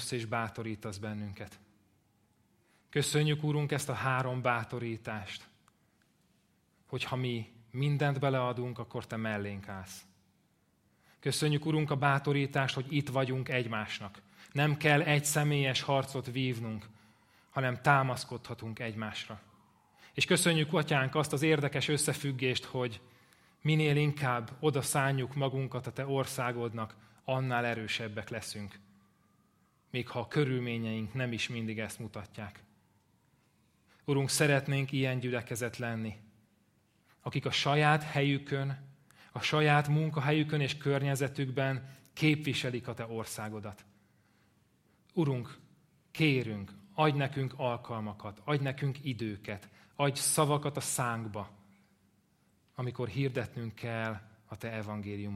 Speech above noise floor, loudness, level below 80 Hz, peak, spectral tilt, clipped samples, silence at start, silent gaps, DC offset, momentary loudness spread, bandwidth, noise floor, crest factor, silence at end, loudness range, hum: 39 dB; -32 LUFS; -70 dBFS; -10 dBFS; -5 dB/octave; under 0.1%; 0 s; none; under 0.1%; 15 LU; 15.5 kHz; -72 dBFS; 24 dB; 0 s; 7 LU; none